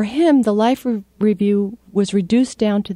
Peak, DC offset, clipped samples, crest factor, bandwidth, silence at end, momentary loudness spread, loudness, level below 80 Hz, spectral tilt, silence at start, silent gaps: -4 dBFS; under 0.1%; under 0.1%; 14 dB; 14 kHz; 0 s; 7 LU; -17 LUFS; -54 dBFS; -6.5 dB/octave; 0 s; none